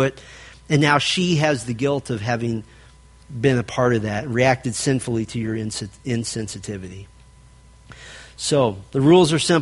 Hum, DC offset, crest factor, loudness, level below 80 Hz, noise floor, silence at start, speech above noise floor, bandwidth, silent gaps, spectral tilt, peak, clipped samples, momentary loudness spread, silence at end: none; under 0.1%; 20 dB; -20 LUFS; -50 dBFS; -48 dBFS; 0 s; 28 dB; 11.5 kHz; none; -5 dB/octave; -2 dBFS; under 0.1%; 18 LU; 0 s